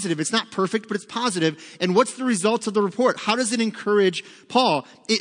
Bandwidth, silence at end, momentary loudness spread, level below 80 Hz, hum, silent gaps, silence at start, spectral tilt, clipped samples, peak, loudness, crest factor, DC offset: 10.5 kHz; 0 s; 5 LU; -76 dBFS; none; none; 0 s; -4 dB/octave; under 0.1%; -4 dBFS; -22 LUFS; 18 dB; under 0.1%